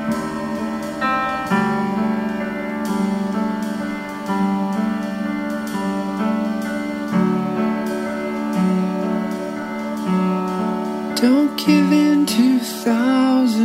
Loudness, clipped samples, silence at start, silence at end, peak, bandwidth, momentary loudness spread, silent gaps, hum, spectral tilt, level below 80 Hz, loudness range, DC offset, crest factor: -20 LUFS; under 0.1%; 0 s; 0 s; -4 dBFS; 16 kHz; 9 LU; none; none; -6 dB/octave; -54 dBFS; 5 LU; under 0.1%; 16 dB